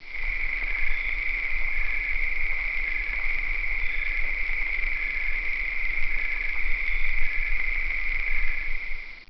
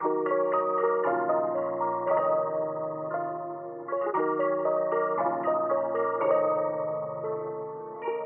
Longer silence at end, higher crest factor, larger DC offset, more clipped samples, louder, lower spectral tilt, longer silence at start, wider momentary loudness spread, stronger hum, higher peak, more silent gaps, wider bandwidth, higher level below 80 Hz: about the same, 0 s vs 0 s; about the same, 14 dB vs 16 dB; first, 1% vs under 0.1%; neither; about the same, -27 LUFS vs -28 LUFS; second, -4.5 dB/octave vs -6.5 dB/octave; about the same, 0 s vs 0 s; second, 1 LU vs 8 LU; neither; about the same, -10 dBFS vs -12 dBFS; neither; first, 5.8 kHz vs 3.2 kHz; first, -30 dBFS vs under -90 dBFS